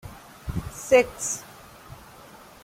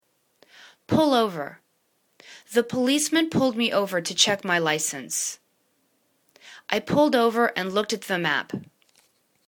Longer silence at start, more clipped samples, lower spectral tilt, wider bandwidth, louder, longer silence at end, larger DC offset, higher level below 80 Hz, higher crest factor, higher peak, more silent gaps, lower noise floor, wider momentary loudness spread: second, 0.05 s vs 0.65 s; neither; about the same, -3.5 dB/octave vs -3 dB/octave; second, 16.5 kHz vs 19 kHz; about the same, -25 LUFS vs -23 LUFS; second, 0.25 s vs 0.85 s; neither; first, -46 dBFS vs -66 dBFS; about the same, 22 dB vs 22 dB; about the same, -6 dBFS vs -4 dBFS; neither; second, -48 dBFS vs -69 dBFS; first, 26 LU vs 10 LU